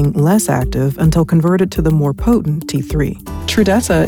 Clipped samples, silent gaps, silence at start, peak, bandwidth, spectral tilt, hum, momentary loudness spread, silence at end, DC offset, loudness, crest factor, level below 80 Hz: under 0.1%; none; 0 s; -2 dBFS; 18.5 kHz; -6.5 dB/octave; none; 6 LU; 0 s; under 0.1%; -15 LUFS; 10 dB; -26 dBFS